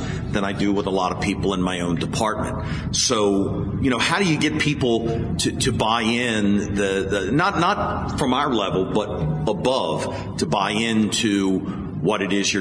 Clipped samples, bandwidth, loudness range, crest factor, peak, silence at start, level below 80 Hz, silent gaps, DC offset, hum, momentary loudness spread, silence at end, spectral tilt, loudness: under 0.1%; 11 kHz; 2 LU; 16 dB; -4 dBFS; 0 s; -40 dBFS; none; under 0.1%; none; 5 LU; 0 s; -4.5 dB/octave; -21 LUFS